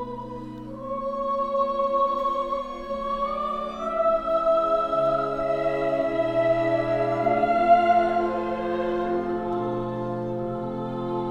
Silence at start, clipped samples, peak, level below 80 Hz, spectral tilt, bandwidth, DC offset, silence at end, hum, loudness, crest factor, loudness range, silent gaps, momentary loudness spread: 0 s; under 0.1%; -6 dBFS; -48 dBFS; -7.5 dB/octave; 7.2 kHz; under 0.1%; 0 s; none; -25 LUFS; 18 dB; 4 LU; none; 9 LU